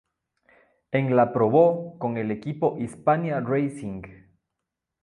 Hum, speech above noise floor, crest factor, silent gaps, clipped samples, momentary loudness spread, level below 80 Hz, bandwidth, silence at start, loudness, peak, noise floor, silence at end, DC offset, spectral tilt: none; 61 dB; 18 dB; none; under 0.1%; 11 LU; -62 dBFS; 11 kHz; 0.9 s; -24 LUFS; -6 dBFS; -84 dBFS; 0.9 s; under 0.1%; -8.5 dB/octave